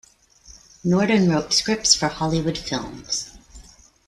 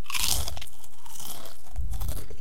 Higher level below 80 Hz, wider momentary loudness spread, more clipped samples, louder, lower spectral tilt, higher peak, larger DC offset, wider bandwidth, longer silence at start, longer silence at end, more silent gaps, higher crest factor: second, -48 dBFS vs -38 dBFS; second, 11 LU vs 19 LU; neither; first, -21 LUFS vs -32 LUFS; first, -3.5 dB/octave vs -1.5 dB/octave; about the same, -2 dBFS vs -4 dBFS; second, under 0.1% vs 8%; second, 12.5 kHz vs 17 kHz; first, 0.5 s vs 0.05 s; first, 0.45 s vs 0 s; neither; second, 22 dB vs 30 dB